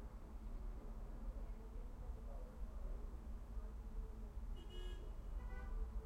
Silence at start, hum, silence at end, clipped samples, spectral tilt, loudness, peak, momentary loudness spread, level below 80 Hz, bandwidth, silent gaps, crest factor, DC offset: 0 s; none; 0 s; under 0.1%; -7 dB/octave; -54 LUFS; -34 dBFS; 3 LU; -48 dBFS; 8.6 kHz; none; 14 dB; under 0.1%